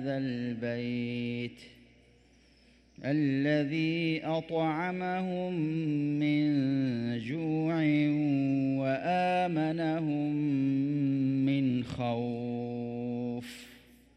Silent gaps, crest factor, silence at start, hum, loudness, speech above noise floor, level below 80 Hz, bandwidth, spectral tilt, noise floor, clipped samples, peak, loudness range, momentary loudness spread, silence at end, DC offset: none; 14 dB; 0 s; none; -31 LUFS; 32 dB; -66 dBFS; 9 kHz; -8 dB/octave; -62 dBFS; under 0.1%; -18 dBFS; 4 LU; 8 LU; 0.4 s; under 0.1%